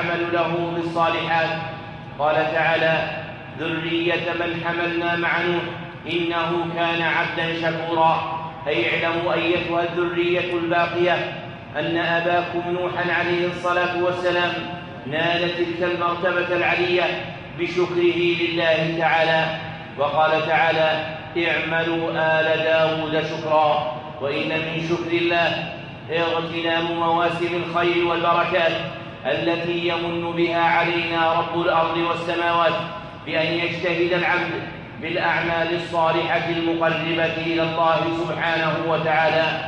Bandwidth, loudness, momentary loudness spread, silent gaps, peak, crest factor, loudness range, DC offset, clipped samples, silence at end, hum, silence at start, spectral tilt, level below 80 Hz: 8.4 kHz; -21 LUFS; 8 LU; none; -4 dBFS; 16 dB; 2 LU; under 0.1%; under 0.1%; 0 s; none; 0 s; -6 dB/octave; -54 dBFS